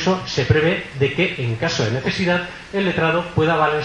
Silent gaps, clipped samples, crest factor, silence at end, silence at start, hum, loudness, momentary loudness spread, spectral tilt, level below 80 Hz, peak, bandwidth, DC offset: none; under 0.1%; 18 dB; 0 s; 0 s; none; -19 LUFS; 5 LU; -5.5 dB/octave; -44 dBFS; -2 dBFS; 10.5 kHz; under 0.1%